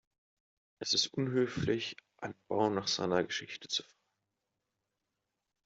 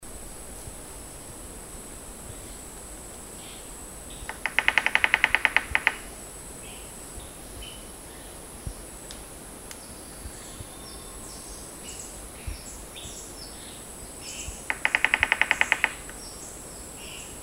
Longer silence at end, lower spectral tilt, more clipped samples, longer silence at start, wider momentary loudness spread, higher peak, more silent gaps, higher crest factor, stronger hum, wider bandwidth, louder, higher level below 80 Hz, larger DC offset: first, 1.85 s vs 0 s; first, -4 dB/octave vs -1.5 dB/octave; neither; first, 0.8 s vs 0 s; second, 12 LU vs 18 LU; second, -14 dBFS vs 0 dBFS; neither; second, 22 dB vs 32 dB; neither; second, 8 kHz vs 16 kHz; second, -33 LUFS vs -28 LUFS; second, -68 dBFS vs -48 dBFS; neither